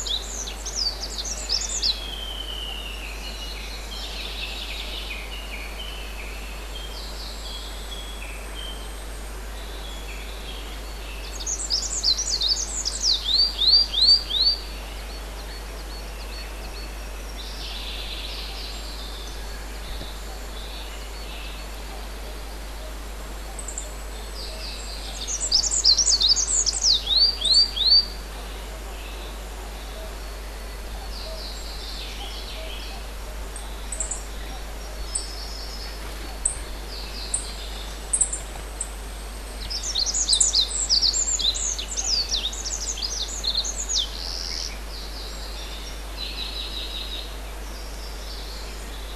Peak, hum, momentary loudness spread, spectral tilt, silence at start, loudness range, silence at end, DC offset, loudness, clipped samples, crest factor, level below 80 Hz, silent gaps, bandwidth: -4 dBFS; none; 19 LU; -0.5 dB/octave; 0 s; 16 LU; 0 s; under 0.1%; -23 LUFS; under 0.1%; 24 dB; -34 dBFS; none; 13.5 kHz